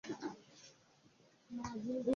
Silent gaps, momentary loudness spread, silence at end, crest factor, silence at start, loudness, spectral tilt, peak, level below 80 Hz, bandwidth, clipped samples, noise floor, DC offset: none; 19 LU; 0 s; 20 dB; 0.05 s; -45 LUFS; -5.5 dB/octave; -24 dBFS; -70 dBFS; 7.2 kHz; under 0.1%; -69 dBFS; under 0.1%